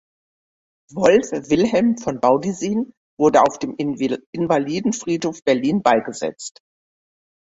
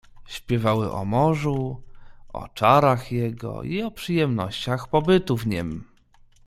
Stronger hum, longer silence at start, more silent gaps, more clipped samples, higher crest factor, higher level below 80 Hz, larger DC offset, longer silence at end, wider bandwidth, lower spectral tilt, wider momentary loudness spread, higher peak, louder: neither; first, 0.9 s vs 0.15 s; first, 2.97-3.17 s, 4.26-4.33 s vs none; neither; about the same, 18 dB vs 20 dB; second, -58 dBFS vs -48 dBFS; neither; first, 1 s vs 0.65 s; second, 8 kHz vs 15.5 kHz; second, -5.5 dB/octave vs -7 dB/octave; second, 11 LU vs 19 LU; about the same, -2 dBFS vs -4 dBFS; first, -19 LUFS vs -23 LUFS